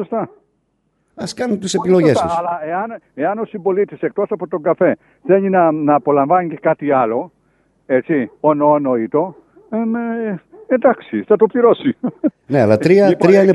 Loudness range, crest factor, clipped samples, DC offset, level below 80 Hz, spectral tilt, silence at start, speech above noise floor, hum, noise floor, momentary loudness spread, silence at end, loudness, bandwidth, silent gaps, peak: 3 LU; 16 dB; under 0.1%; under 0.1%; -60 dBFS; -7 dB/octave; 0 s; 50 dB; none; -65 dBFS; 11 LU; 0 s; -16 LUFS; 11.5 kHz; none; 0 dBFS